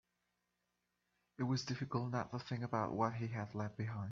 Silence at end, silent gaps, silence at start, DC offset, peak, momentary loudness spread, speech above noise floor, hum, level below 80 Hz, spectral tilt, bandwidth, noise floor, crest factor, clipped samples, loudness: 0 s; none; 1.4 s; under 0.1%; -22 dBFS; 5 LU; 46 dB; 60 Hz at -60 dBFS; -72 dBFS; -6 dB/octave; 7.4 kHz; -86 dBFS; 20 dB; under 0.1%; -41 LUFS